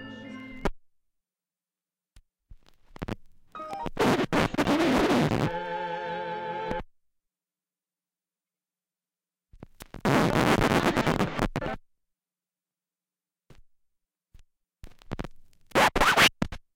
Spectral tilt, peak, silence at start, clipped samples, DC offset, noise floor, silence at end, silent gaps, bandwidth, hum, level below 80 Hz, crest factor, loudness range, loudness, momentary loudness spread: -4.5 dB/octave; -6 dBFS; 0 s; under 0.1%; under 0.1%; under -90 dBFS; 0.2 s; none; 17 kHz; none; -44 dBFS; 24 dB; 16 LU; -26 LUFS; 20 LU